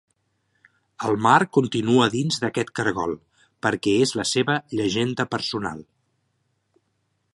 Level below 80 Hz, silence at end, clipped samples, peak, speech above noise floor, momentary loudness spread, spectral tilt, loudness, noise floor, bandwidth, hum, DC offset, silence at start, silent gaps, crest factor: -58 dBFS; 1.55 s; under 0.1%; -2 dBFS; 50 dB; 12 LU; -4.5 dB/octave; -22 LUFS; -72 dBFS; 11.5 kHz; none; under 0.1%; 1 s; none; 22 dB